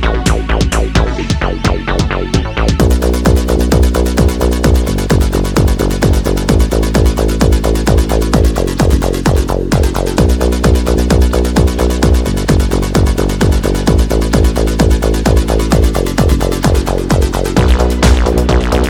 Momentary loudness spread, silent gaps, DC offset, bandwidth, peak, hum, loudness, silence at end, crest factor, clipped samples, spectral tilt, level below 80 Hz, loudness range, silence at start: 3 LU; none; under 0.1%; 18 kHz; 0 dBFS; none; -12 LUFS; 0 s; 10 dB; under 0.1%; -6 dB/octave; -14 dBFS; 1 LU; 0 s